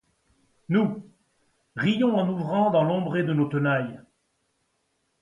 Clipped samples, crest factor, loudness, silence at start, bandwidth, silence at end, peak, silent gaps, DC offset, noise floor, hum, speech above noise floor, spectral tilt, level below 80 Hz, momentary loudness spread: under 0.1%; 16 dB; -24 LUFS; 0.7 s; 9.4 kHz; 1.2 s; -10 dBFS; none; under 0.1%; -73 dBFS; none; 50 dB; -8.5 dB/octave; -68 dBFS; 7 LU